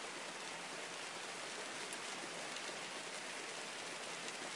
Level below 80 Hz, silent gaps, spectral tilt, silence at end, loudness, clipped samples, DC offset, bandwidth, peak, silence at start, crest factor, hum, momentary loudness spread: under -90 dBFS; none; -1 dB/octave; 0 s; -45 LUFS; under 0.1%; under 0.1%; 11.5 kHz; -28 dBFS; 0 s; 20 dB; none; 2 LU